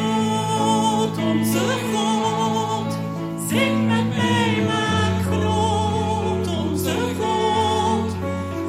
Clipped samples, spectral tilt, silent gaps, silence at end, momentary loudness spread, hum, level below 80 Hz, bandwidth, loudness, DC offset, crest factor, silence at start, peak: under 0.1%; -5 dB/octave; none; 0 s; 5 LU; none; -56 dBFS; 16 kHz; -21 LUFS; under 0.1%; 14 dB; 0 s; -6 dBFS